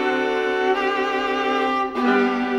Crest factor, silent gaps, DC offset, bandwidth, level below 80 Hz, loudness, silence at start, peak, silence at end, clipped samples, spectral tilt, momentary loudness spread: 14 dB; none; under 0.1%; 11 kHz; -56 dBFS; -21 LUFS; 0 s; -6 dBFS; 0 s; under 0.1%; -4.5 dB/octave; 3 LU